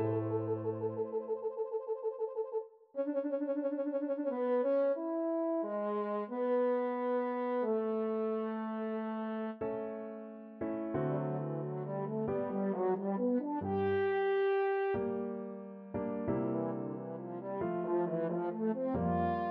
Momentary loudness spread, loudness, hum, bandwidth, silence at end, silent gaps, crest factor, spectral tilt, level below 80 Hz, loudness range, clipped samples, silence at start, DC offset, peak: 8 LU; -35 LUFS; none; 5 kHz; 0 s; none; 12 dB; -7.5 dB/octave; -68 dBFS; 4 LU; under 0.1%; 0 s; under 0.1%; -22 dBFS